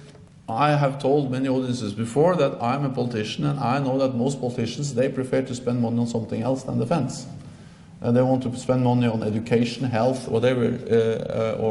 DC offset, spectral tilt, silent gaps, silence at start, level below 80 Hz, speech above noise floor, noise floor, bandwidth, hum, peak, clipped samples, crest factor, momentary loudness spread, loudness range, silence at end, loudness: under 0.1%; -7 dB/octave; none; 0 s; -56 dBFS; 22 dB; -44 dBFS; 11.5 kHz; none; -6 dBFS; under 0.1%; 16 dB; 7 LU; 3 LU; 0 s; -23 LUFS